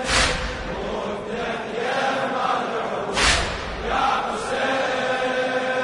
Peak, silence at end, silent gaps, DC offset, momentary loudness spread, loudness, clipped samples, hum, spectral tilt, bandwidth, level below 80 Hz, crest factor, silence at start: -4 dBFS; 0 s; none; under 0.1%; 9 LU; -23 LUFS; under 0.1%; none; -3 dB/octave; 11 kHz; -38 dBFS; 20 dB; 0 s